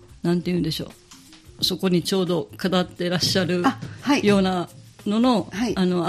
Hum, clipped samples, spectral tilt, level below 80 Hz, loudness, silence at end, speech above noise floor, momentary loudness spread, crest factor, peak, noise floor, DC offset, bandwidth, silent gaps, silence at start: none; under 0.1%; -5.5 dB/octave; -50 dBFS; -22 LUFS; 0 s; 25 dB; 9 LU; 16 dB; -6 dBFS; -47 dBFS; under 0.1%; 14.5 kHz; none; 0.1 s